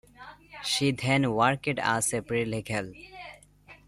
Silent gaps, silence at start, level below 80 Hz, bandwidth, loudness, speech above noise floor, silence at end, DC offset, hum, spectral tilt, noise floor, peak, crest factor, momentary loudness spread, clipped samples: none; 0.2 s; -58 dBFS; 15.5 kHz; -27 LUFS; 27 dB; 0.1 s; under 0.1%; 50 Hz at -55 dBFS; -4 dB/octave; -54 dBFS; -8 dBFS; 20 dB; 21 LU; under 0.1%